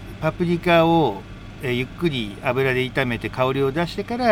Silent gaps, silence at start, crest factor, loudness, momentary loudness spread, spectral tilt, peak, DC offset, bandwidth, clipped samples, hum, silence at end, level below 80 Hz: none; 0 s; 16 dB; -21 LUFS; 9 LU; -7 dB/octave; -4 dBFS; under 0.1%; 16.5 kHz; under 0.1%; none; 0 s; -42 dBFS